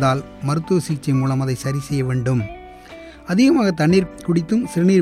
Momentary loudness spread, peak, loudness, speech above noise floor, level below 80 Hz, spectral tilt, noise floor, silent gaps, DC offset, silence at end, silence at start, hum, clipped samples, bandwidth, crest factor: 18 LU; -4 dBFS; -19 LUFS; 21 dB; -46 dBFS; -7 dB/octave; -39 dBFS; none; under 0.1%; 0 s; 0 s; none; under 0.1%; 14 kHz; 14 dB